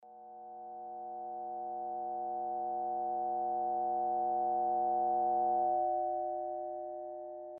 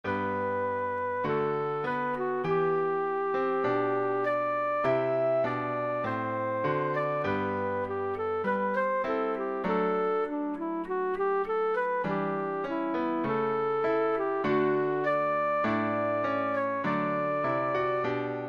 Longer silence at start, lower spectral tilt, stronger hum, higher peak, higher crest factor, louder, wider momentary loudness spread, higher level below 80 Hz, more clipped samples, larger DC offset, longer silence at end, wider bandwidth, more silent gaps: about the same, 0 s vs 0.05 s; second, -2 dB/octave vs -8 dB/octave; neither; second, -24 dBFS vs -16 dBFS; about the same, 12 dB vs 12 dB; second, -35 LUFS vs -29 LUFS; first, 14 LU vs 4 LU; second, -72 dBFS vs -64 dBFS; neither; neither; about the same, 0 s vs 0 s; second, 1.9 kHz vs 6.6 kHz; neither